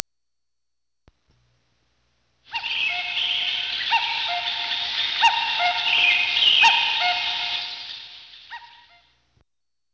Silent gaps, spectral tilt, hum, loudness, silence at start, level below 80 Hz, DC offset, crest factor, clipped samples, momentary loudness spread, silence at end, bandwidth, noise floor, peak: none; 1 dB/octave; none; -20 LUFS; 2.5 s; -64 dBFS; under 0.1%; 24 dB; under 0.1%; 21 LU; 1.3 s; 8 kHz; -86 dBFS; -2 dBFS